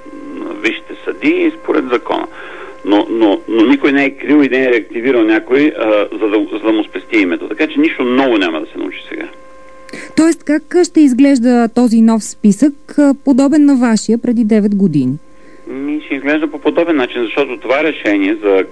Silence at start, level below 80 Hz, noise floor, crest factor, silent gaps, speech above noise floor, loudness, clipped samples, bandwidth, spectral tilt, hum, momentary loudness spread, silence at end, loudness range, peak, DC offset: 0.05 s; -54 dBFS; -35 dBFS; 12 dB; none; 23 dB; -13 LUFS; under 0.1%; 11 kHz; -5.5 dB/octave; none; 13 LU; 0 s; 5 LU; 0 dBFS; 2%